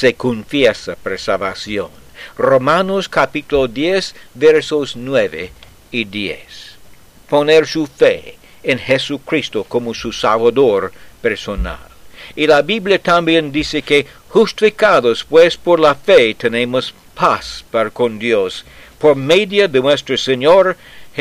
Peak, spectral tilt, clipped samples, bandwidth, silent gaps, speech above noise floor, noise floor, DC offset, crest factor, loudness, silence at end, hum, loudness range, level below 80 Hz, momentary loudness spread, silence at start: 0 dBFS; -4.5 dB/octave; under 0.1%; 14.5 kHz; none; 28 dB; -43 dBFS; under 0.1%; 14 dB; -14 LUFS; 0 s; none; 5 LU; -40 dBFS; 13 LU; 0 s